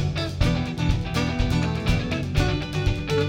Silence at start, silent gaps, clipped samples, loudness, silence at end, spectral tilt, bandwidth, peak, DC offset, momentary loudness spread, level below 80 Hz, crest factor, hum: 0 s; none; under 0.1%; -24 LUFS; 0 s; -6 dB/octave; 16.5 kHz; -6 dBFS; under 0.1%; 2 LU; -30 dBFS; 16 dB; none